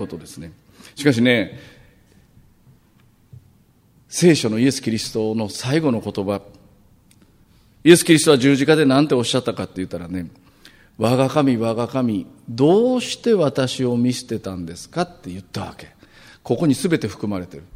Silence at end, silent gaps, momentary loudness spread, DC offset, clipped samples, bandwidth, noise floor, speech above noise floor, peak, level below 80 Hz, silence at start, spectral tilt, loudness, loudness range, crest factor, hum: 0.15 s; none; 16 LU; under 0.1%; under 0.1%; 16 kHz; -55 dBFS; 36 dB; 0 dBFS; -56 dBFS; 0 s; -5 dB/octave; -19 LUFS; 8 LU; 20 dB; none